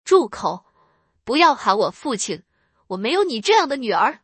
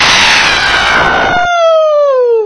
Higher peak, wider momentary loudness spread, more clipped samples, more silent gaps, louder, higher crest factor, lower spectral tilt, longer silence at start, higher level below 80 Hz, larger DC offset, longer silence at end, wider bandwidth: about the same, -2 dBFS vs 0 dBFS; first, 15 LU vs 4 LU; second, under 0.1% vs 0.7%; neither; second, -19 LUFS vs -7 LUFS; first, 18 dB vs 8 dB; first, -3 dB/octave vs -1.5 dB/octave; about the same, 0.05 s vs 0 s; second, -64 dBFS vs -32 dBFS; neither; about the same, 0.05 s vs 0 s; second, 8.8 kHz vs 11 kHz